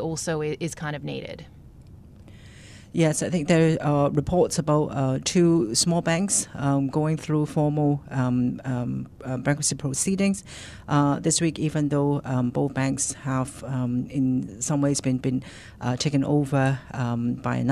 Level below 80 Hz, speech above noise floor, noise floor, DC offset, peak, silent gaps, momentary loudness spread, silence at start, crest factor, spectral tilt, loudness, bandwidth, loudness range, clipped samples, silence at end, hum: -52 dBFS; 22 dB; -46 dBFS; under 0.1%; -8 dBFS; none; 10 LU; 0 s; 16 dB; -5 dB/octave; -24 LUFS; 14 kHz; 4 LU; under 0.1%; 0 s; none